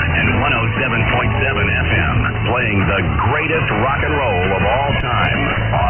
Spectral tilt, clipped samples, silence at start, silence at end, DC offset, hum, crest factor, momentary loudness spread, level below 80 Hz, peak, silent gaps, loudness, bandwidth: -10 dB/octave; under 0.1%; 0 s; 0 s; under 0.1%; none; 12 dB; 2 LU; -26 dBFS; -4 dBFS; none; -16 LUFS; 3.3 kHz